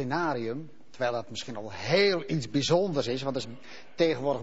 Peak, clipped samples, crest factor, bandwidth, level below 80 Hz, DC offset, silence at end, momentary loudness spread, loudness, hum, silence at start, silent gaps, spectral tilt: -12 dBFS; under 0.1%; 18 dB; 8 kHz; -66 dBFS; 0.6%; 0 s; 15 LU; -29 LUFS; none; 0 s; none; -5 dB/octave